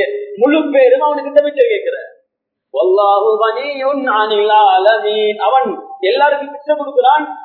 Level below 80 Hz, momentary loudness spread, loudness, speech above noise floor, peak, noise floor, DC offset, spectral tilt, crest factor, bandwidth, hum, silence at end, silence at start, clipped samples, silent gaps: -76 dBFS; 9 LU; -13 LUFS; 61 dB; 0 dBFS; -74 dBFS; under 0.1%; -6.5 dB/octave; 12 dB; 4.6 kHz; none; 0 s; 0 s; under 0.1%; none